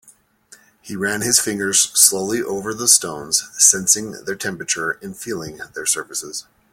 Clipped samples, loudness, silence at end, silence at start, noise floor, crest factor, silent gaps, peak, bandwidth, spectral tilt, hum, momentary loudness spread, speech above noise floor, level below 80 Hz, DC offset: under 0.1%; -16 LUFS; 0.3 s; 0.85 s; -51 dBFS; 20 dB; none; 0 dBFS; 17 kHz; -1 dB/octave; none; 16 LU; 31 dB; -58 dBFS; under 0.1%